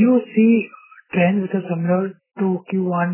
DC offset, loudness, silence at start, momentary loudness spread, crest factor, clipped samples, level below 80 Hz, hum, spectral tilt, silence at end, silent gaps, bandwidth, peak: under 0.1%; -19 LUFS; 0 s; 9 LU; 14 dB; under 0.1%; -66 dBFS; none; -12 dB/octave; 0 s; none; 3.2 kHz; -4 dBFS